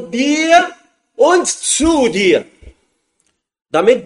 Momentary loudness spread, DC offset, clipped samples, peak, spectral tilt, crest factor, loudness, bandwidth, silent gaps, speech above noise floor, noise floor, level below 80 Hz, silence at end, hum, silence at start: 6 LU; under 0.1%; under 0.1%; 0 dBFS; -2.5 dB/octave; 14 dB; -13 LUFS; 11.5 kHz; none; 53 dB; -65 dBFS; -42 dBFS; 0 s; none; 0 s